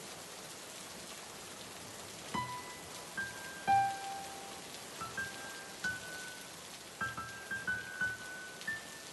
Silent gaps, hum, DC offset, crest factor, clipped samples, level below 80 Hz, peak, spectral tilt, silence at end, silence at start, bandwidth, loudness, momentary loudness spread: none; none; under 0.1%; 20 dB; under 0.1%; -70 dBFS; -20 dBFS; -2 dB/octave; 0 s; 0 s; 12 kHz; -40 LUFS; 10 LU